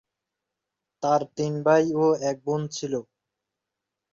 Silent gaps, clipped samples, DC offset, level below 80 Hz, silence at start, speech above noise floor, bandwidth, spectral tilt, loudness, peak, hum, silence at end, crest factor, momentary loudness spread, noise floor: none; under 0.1%; under 0.1%; -70 dBFS; 1 s; 62 dB; 7.8 kHz; -6 dB/octave; -25 LUFS; -8 dBFS; none; 1.1 s; 20 dB; 10 LU; -86 dBFS